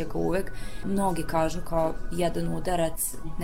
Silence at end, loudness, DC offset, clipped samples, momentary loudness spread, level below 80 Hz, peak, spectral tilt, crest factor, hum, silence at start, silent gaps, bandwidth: 0 s; -29 LUFS; 3%; under 0.1%; 4 LU; -36 dBFS; -12 dBFS; -5 dB/octave; 14 dB; none; 0 s; none; 16 kHz